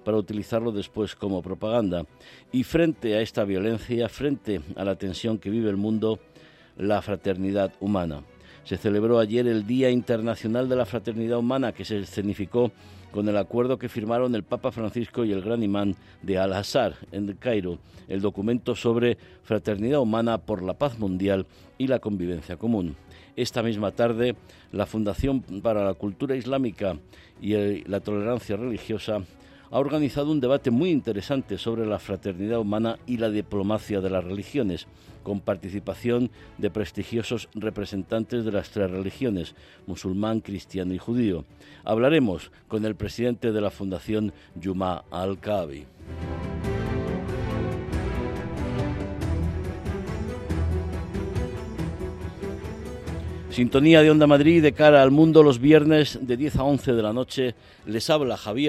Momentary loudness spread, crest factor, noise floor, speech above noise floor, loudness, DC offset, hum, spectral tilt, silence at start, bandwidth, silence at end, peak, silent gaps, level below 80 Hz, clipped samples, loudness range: 11 LU; 22 dB; -52 dBFS; 28 dB; -25 LUFS; under 0.1%; none; -7 dB/octave; 0.05 s; 13.5 kHz; 0 s; -2 dBFS; none; -46 dBFS; under 0.1%; 11 LU